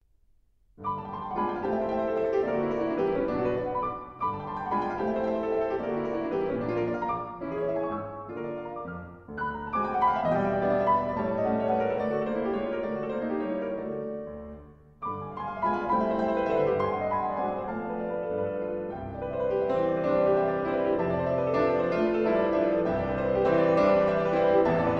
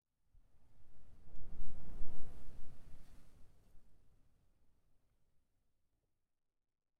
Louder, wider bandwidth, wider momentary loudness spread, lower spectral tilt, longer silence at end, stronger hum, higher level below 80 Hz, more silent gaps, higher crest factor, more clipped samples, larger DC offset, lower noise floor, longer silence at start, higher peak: first, -28 LUFS vs -59 LUFS; first, 6.8 kHz vs 1.7 kHz; about the same, 11 LU vs 12 LU; about the same, -8.5 dB/octave vs -7.5 dB/octave; second, 0 s vs 3.05 s; neither; about the same, -52 dBFS vs -54 dBFS; neither; about the same, 16 dB vs 14 dB; neither; neither; second, -63 dBFS vs -83 dBFS; about the same, 0.8 s vs 0.7 s; first, -10 dBFS vs -20 dBFS